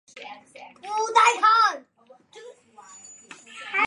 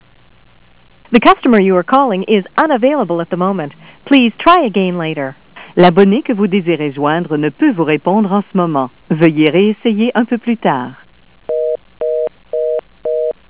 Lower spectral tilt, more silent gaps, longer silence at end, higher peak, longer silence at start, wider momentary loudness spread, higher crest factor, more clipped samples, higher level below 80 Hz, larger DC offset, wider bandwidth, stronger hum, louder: second, 0.5 dB/octave vs -10.5 dB/octave; neither; second, 0 s vs 0.15 s; second, -6 dBFS vs 0 dBFS; second, 0.15 s vs 1.1 s; first, 26 LU vs 11 LU; first, 20 dB vs 14 dB; second, under 0.1% vs 0.3%; second, -86 dBFS vs -52 dBFS; second, under 0.1% vs 0.4%; first, 11 kHz vs 4 kHz; neither; second, -20 LUFS vs -13 LUFS